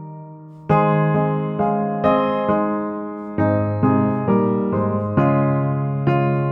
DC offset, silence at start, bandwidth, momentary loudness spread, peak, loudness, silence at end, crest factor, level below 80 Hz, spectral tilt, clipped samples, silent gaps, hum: under 0.1%; 0 s; 4.2 kHz; 9 LU; -4 dBFS; -19 LUFS; 0 s; 14 dB; -52 dBFS; -11 dB/octave; under 0.1%; none; none